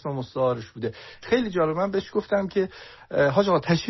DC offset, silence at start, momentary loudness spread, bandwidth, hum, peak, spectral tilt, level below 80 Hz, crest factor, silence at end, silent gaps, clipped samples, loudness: under 0.1%; 0.05 s; 12 LU; 6.2 kHz; none; -6 dBFS; -5 dB/octave; -56 dBFS; 18 dB; 0 s; none; under 0.1%; -25 LUFS